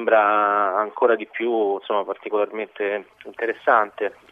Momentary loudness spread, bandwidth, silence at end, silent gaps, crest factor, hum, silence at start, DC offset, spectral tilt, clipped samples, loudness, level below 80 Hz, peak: 10 LU; 4.8 kHz; 0.2 s; none; 18 dB; none; 0 s; under 0.1%; -6 dB/octave; under 0.1%; -22 LUFS; -76 dBFS; -2 dBFS